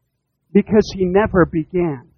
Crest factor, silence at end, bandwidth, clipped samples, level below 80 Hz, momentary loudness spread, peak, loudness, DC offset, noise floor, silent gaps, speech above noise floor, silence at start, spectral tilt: 16 dB; 0.15 s; 6.8 kHz; under 0.1%; -38 dBFS; 6 LU; 0 dBFS; -17 LUFS; under 0.1%; -70 dBFS; none; 54 dB; 0.55 s; -7.5 dB/octave